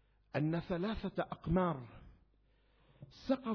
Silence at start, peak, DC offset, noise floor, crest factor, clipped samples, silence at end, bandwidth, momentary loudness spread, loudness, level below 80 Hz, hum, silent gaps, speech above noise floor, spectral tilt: 0.35 s; -20 dBFS; under 0.1%; -71 dBFS; 18 dB; under 0.1%; 0 s; 5.4 kHz; 15 LU; -38 LUFS; -56 dBFS; none; none; 35 dB; -6.5 dB/octave